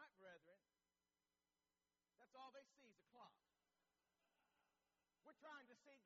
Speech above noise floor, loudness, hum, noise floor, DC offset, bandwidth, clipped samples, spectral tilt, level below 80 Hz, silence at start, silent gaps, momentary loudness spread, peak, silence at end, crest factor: over 22 dB; -65 LUFS; none; under -90 dBFS; under 0.1%; 7.2 kHz; under 0.1%; -1 dB/octave; under -90 dBFS; 0 s; none; 7 LU; -50 dBFS; 0 s; 20 dB